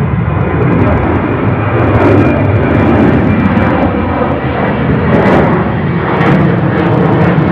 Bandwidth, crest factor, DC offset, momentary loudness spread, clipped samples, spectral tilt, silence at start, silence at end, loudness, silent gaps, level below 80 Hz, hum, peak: 6.2 kHz; 10 dB; under 0.1%; 5 LU; under 0.1%; -9.5 dB/octave; 0 s; 0 s; -10 LUFS; none; -28 dBFS; none; 0 dBFS